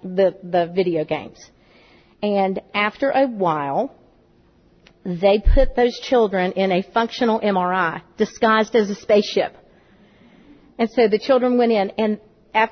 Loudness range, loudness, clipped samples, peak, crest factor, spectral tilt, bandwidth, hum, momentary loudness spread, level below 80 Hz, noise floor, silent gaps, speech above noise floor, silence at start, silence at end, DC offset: 4 LU; -20 LUFS; under 0.1%; -4 dBFS; 16 dB; -6 dB/octave; 6.6 kHz; none; 8 LU; -32 dBFS; -55 dBFS; none; 36 dB; 0.05 s; 0 s; under 0.1%